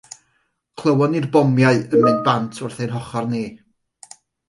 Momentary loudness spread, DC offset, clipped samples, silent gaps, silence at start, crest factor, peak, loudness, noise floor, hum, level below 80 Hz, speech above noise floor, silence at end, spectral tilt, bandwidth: 12 LU; under 0.1%; under 0.1%; none; 0.75 s; 16 dB; -4 dBFS; -18 LUFS; -67 dBFS; none; -60 dBFS; 50 dB; 0.9 s; -7 dB/octave; 11.5 kHz